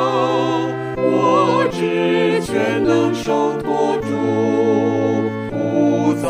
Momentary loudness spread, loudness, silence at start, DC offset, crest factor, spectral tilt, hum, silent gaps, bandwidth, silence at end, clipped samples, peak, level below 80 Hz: 5 LU; -17 LUFS; 0 s; under 0.1%; 14 dB; -6.5 dB/octave; none; none; 15.5 kHz; 0 s; under 0.1%; -4 dBFS; -50 dBFS